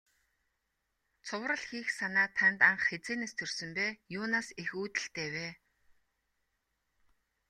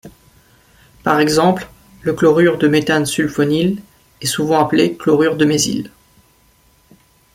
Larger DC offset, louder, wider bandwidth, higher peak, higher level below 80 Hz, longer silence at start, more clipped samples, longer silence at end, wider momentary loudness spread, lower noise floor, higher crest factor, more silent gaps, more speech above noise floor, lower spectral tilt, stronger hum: neither; second, -32 LUFS vs -15 LUFS; second, 12.5 kHz vs 16.5 kHz; second, -10 dBFS vs -2 dBFS; second, -76 dBFS vs -50 dBFS; first, 1.25 s vs 0.05 s; neither; first, 1.95 s vs 1.45 s; about the same, 13 LU vs 11 LU; first, -82 dBFS vs -53 dBFS; first, 26 dB vs 16 dB; neither; first, 49 dB vs 39 dB; second, -3 dB/octave vs -5 dB/octave; neither